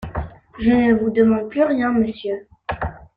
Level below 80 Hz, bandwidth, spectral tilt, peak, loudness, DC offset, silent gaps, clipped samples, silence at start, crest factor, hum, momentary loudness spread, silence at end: -40 dBFS; 4.9 kHz; -9.5 dB/octave; -4 dBFS; -19 LUFS; under 0.1%; none; under 0.1%; 0 s; 16 dB; none; 14 LU; 0.1 s